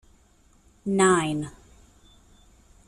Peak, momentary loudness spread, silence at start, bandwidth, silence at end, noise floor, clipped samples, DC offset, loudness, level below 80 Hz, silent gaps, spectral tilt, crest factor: -8 dBFS; 17 LU; 0.85 s; 12.5 kHz; 1.4 s; -59 dBFS; under 0.1%; under 0.1%; -23 LUFS; -56 dBFS; none; -4.5 dB/octave; 20 dB